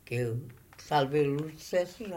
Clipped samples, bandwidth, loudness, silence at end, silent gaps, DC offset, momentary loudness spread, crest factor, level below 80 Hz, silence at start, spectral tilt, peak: under 0.1%; 16 kHz; -31 LUFS; 0 s; none; under 0.1%; 15 LU; 18 dB; -62 dBFS; 0.1 s; -6 dB/octave; -14 dBFS